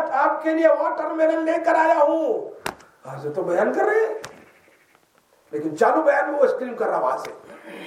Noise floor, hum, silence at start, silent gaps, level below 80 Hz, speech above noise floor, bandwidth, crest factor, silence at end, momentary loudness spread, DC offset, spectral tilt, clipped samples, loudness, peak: -60 dBFS; none; 0 s; none; -70 dBFS; 39 dB; 13.5 kHz; 18 dB; 0 s; 16 LU; under 0.1%; -5.5 dB/octave; under 0.1%; -21 LUFS; -4 dBFS